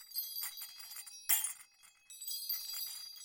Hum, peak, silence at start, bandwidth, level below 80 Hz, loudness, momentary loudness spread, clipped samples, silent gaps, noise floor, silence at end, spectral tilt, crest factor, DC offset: none; -14 dBFS; 0 s; 17 kHz; -86 dBFS; -37 LUFS; 15 LU; under 0.1%; none; -62 dBFS; 0 s; 4.5 dB/octave; 28 dB; under 0.1%